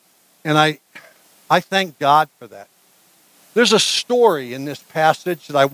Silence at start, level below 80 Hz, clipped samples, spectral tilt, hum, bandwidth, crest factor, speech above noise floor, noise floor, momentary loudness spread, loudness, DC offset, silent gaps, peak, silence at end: 0.45 s; -72 dBFS; under 0.1%; -3.5 dB/octave; none; 16 kHz; 20 dB; 38 dB; -55 dBFS; 12 LU; -17 LUFS; under 0.1%; none; 0 dBFS; 0.05 s